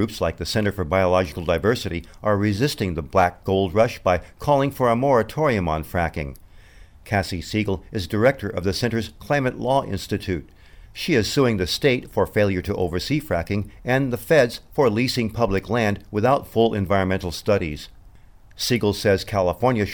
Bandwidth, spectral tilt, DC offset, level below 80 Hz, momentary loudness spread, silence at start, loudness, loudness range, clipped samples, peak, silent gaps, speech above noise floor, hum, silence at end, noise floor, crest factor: over 20 kHz; -6 dB/octave; 0.2%; -42 dBFS; 8 LU; 0 s; -22 LUFS; 3 LU; under 0.1%; -6 dBFS; none; 26 dB; none; 0 s; -48 dBFS; 16 dB